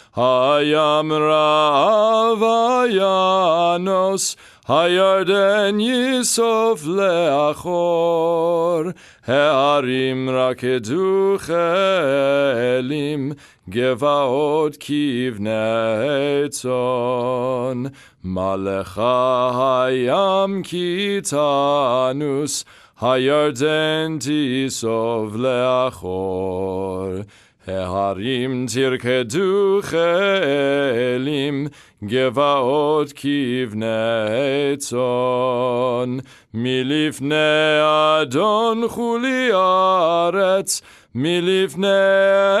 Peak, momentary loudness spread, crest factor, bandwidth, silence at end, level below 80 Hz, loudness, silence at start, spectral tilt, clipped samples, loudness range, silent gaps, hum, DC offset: -2 dBFS; 8 LU; 16 dB; 13.5 kHz; 0 s; -60 dBFS; -18 LUFS; 0.15 s; -4.5 dB/octave; under 0.1%; 4 LU; none; none; under 0.1%